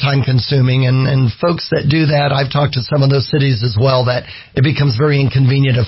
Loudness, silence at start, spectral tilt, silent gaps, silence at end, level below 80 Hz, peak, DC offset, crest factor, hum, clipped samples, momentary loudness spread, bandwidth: -14 LUFS; 0 s; -10.5 dB/octave; none; 0 s; -38 dBFS; -2 dBFS; under 0.1%; 10 dB; none; under 0.1%; 4 LU; 5.8 kHz